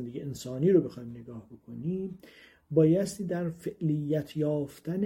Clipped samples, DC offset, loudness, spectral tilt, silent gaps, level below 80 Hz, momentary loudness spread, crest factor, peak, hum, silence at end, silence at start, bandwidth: under 0.1%; under 0.1%; -29 LUFS; -8 dB/octave; none; -64 dBFS; 19 LU; 18 dB; -12 dBFS; none; 0 s; 0 s; 16.5 kHz